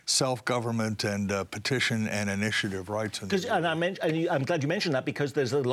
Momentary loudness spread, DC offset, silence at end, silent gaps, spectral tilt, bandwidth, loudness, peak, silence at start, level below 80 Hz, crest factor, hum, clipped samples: 4 LU; under 0.1%; 0 s; none; -4 dB/octave; 16 kHz; -28 LUFS; -12 dBFS; 0.05 s; -70 dBFS; 16 dB; none; under 0.1%